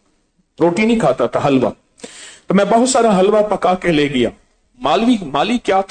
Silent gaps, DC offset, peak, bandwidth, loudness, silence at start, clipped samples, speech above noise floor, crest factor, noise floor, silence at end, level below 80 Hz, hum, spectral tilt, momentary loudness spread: none; under 0.1%; -4 dBFS; 9.4 kHz; -15 LUFS; 0.6 s; under 0.1%; 47 dB; 12 dB; -61 dBFS; 0.05 s; -46 dBFS; none; -5 dB/octave; 9 LU